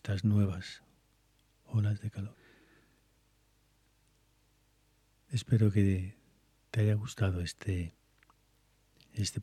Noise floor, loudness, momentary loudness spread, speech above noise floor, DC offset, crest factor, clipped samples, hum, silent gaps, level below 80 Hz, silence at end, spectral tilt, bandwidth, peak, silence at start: -70 dBFS; -33 LUFS; 17 LU; 39 dB; under 0.1%; 18 dB; under 0.1%; 50 Hz at -55 dBFS; none; -60 dBFS; 0 s; -6.5 dB/octave; 12.5 kHz; -16 dBFS; 0.05 s